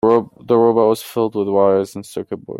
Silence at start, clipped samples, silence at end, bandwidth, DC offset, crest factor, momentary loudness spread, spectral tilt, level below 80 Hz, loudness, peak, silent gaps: 0.05 s; under 0.1%; 0 s; 16 kHz; under 0.1%; 14 dB; 13 LU; -7 dB/octave; -60 dBFS; -16 LUFS; -2 dBFS; none